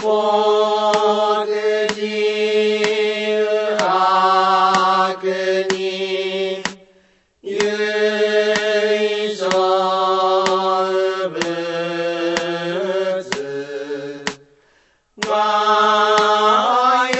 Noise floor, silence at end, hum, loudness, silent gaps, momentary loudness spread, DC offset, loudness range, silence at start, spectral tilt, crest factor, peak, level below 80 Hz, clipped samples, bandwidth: -58 dBFS; 0 s; none; -17 LUFS; none; 10 LU; under 0.1%; 6 LU; 0 s; -3.5 dB/octave; 18 dB; 0 dBFS; -64 dBFS; under 0.1%; 8.4 kHz